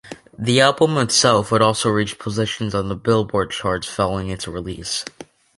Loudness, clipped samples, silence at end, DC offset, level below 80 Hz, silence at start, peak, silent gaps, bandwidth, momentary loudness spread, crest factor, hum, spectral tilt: -19 LUFS; under 0.1%; 0.35 s; under 0.1%; -44 dBFS; 0.05 s; -2 dBFS; none; 11.5 kHz; 12 LU; 18 dB; none; -4 dB/octave